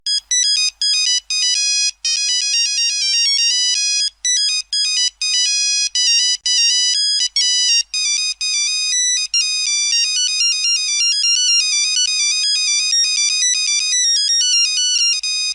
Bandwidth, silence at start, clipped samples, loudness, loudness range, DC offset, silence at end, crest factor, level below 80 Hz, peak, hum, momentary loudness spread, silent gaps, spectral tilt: 11 kHz; 0.05 s; under 0.1%; -13 LUFS; 1 LU; under 0.1%; 0 s; 12 dB; -60 dBFS; -4 dBFS; none; 3 LU; none; 8 dB/octave